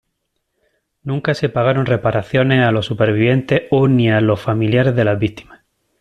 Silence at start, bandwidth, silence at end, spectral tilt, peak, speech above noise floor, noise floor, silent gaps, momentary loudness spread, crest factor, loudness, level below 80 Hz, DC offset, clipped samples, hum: 1.05 s; 9.2 kHz; 0.6 s; -8 dB/octave; -2 dBFS; 57 dB; -72 dBFS; none; 7 LU; 14 dB; -16 LUFS; -48 dBFS; under 0.1%; under 0.1%; none